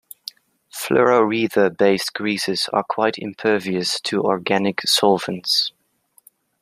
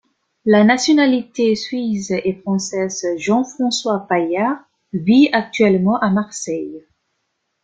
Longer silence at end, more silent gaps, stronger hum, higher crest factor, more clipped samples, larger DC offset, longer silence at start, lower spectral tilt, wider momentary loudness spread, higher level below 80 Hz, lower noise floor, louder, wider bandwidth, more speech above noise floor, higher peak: about the same, 0.9 s vs 0.85 s; neither; neither; about the same, 18 dB vs 16 dB; neither; neither; first, 0.75 s vs 0.45 s; second, -3.5 dB/octave vs -5 dB/octave; about the same, 9 LU vs 11 LU; second, -66 dBFS vs -58 dBFS; second, -60 dBFS vs -72 dBFS; about the same, -19 LUFS vs -17 LUFS; first, 15 kHz vs 9.4 kHz; second, 40 dB vs 55 dB; about the same, -2 dBFS vs -2 dBFS